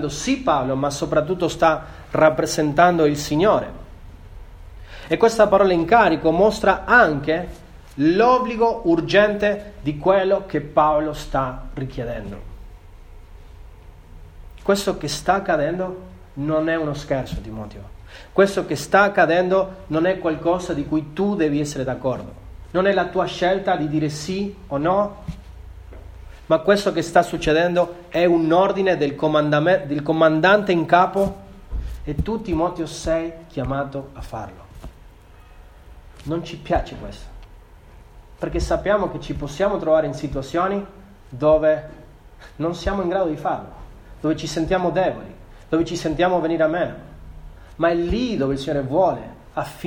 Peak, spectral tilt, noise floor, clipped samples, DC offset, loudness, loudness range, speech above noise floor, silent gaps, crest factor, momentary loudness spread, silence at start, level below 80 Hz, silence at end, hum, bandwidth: 0 dBFS; -5.5 dB/octave; -45 dBFS; under 0.1%; under 0.1%; -20 LUFS; 10 LU; 26 dB; none; 20 dB; 16 LU; 0 s; -40 dBFS; 0 s; none; 17 kHz